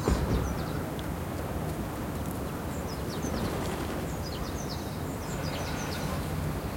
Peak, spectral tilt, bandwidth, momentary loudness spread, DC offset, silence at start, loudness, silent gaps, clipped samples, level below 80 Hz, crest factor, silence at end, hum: -12 dBFS; -5.5 dB/octave; 16.5 kHz; 4 LU; under 0.1%; 0 s; -33 LUFS; none; under 0.1%; -40 dBFS; 20 dB; 0 s; none